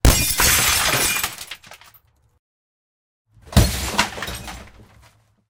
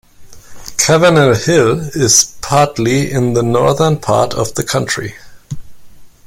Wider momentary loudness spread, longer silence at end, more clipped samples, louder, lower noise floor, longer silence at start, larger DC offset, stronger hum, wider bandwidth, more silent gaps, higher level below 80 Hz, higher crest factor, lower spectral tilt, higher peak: first, 21 LU vs 18 LU; first, 0.85 s vs 0.2 s; neither; second, -18 LUFS vs -12 LUFS; first, -56 dBFS vs -34 dBFS; second, 0.05 s vs 0.2 s; neither; neither; about the same, 18 kHz vs 17 kHz; first, 2.39-3.25 s vs none; first, -28 dBFS vs -42 dBFS; first, 22 dB vs 14 dB; second, -2.5 dB/octave vs -4 dB/octave; about the same, 0 dBFS vs 0 dBFS